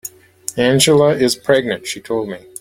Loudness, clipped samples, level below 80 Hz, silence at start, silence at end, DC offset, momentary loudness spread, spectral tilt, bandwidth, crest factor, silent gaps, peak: -15 LUFS; under 0.1%; -52 dBFS; 0.05 s; 0.25 s; under 0.1%; 16 LU; -4 dB/octave; 17 kHz; 16 dB; none; 0 dBFS